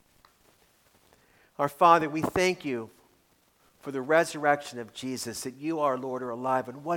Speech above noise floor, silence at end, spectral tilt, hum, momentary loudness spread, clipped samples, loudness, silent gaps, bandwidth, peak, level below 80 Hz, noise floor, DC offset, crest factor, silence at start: 39 dB; 0 s; -4.5 dB/octave; none; 16 LU; under 0.1%; -27 LUFS; none; 19 kHz; -6 dBFS; -64 dBFS; -66 dBFS; under 0.1%; 22 dB; 1.6 s